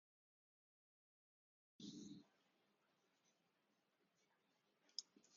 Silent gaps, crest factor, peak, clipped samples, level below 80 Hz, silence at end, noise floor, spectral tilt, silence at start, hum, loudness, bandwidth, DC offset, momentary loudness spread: none; 36 dB; -30 dBFS; under 0.1%; under -90 dBFS; 0 s; -86 dBFS; -4 dB/octave; 1.8 s; none; -57 LUFS; 7.2 kHz; under 0.1%; 7 LU